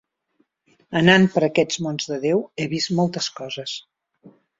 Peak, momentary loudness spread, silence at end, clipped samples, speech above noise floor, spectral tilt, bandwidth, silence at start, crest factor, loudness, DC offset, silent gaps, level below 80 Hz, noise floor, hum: 0 dBFS; 14 LU; 0.3 s; under 0.1%; 47 dB; -5 dB/octave; 7.8 kHz; 0.9 s; 22 dB; -21 LUFS; under 0.1%; none; -60 dBFS; -68 dBFS; none